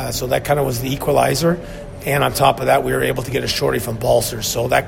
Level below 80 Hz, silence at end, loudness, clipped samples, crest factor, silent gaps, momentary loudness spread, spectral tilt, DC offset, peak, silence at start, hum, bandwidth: -38 dBFS; 0 s; -18 LUFS; under 0.1%; 18 dB; none; 6 LU; -4.5 dB/octave; under 0.1%; 0 dBFS; 0 s; none; 16.5 kHz